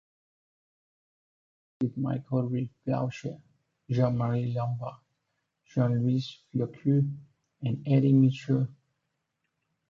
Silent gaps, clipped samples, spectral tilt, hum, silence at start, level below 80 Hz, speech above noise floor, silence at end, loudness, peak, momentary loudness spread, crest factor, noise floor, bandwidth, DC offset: none; under 0.1%; -9 dB/octave; none; 1.8 s; -66 dBFS; 53 dB; 1.2 s; -29 LUFS; -12 dBFS; 12 LU; 18 dB; -81 dBFS; 7.2 kHz; under 0.1%